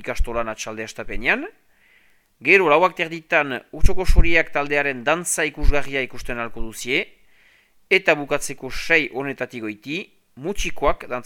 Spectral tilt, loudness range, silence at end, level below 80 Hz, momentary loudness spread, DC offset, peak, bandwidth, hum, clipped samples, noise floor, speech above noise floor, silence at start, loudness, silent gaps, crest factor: -4 dB/octave; 4 LU; 0 s; -28 dBFS; 13 LU; under 0.1%; 0 dBFS; 15.5 kHz; none; under 0.1%; -58 dBFS; 38 dB; 0 s; -21 LUFS; none; 20 dB